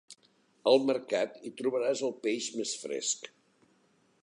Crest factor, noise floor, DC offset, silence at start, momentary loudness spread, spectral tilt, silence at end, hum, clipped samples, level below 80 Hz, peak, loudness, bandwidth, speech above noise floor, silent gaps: 22 dB; -69 dBFS; under 0.1%; 0.1 s; 9 LU; -2.5 dB/octave; 0.95 s; none; under 0.1%; -86 dBFS; -12 dBFS; -31 LUFS; 11 kHz; 38 dB; none